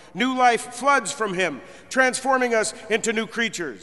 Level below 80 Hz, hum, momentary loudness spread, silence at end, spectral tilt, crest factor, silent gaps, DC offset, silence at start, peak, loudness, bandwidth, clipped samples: -62 dBFS; none; 6 LU; 0.05 s; -2.5 dB/octave; 20 dB; none; 0.2%; 0.15 s; -4 dBFS; -22 LUFS; 11.5 kHz; under 0.1%